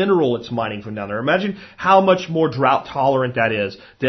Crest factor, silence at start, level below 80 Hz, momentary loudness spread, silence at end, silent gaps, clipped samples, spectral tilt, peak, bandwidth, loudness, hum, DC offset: 18 dB; 0 s; -56 dBFS; 12 LU; 0 s; none; under 0.1%; -7 dB/octave; 0 dBFS; 6.2 kHz; -19 LUFS; none; under 0.1%